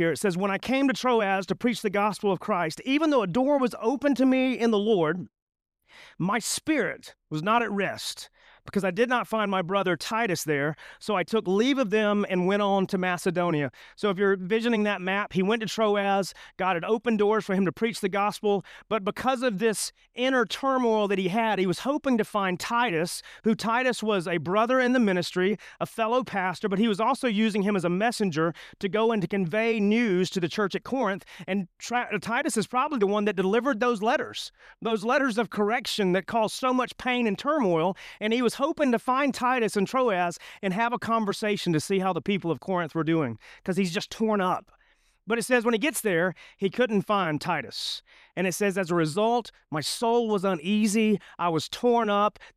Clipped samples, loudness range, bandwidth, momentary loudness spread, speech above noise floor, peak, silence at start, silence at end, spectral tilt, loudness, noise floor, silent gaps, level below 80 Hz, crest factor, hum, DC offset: under 0.1%; 2 LU; 15.5 kHz; 7 LU; 39 dB; -10 dBFS; 0 s; 0.05 s; -5 dB/octave; -26 LUFS; -65 dBFS; 5.42-5.47 s; -64 dBFS; 16 dB; none; under 0.1%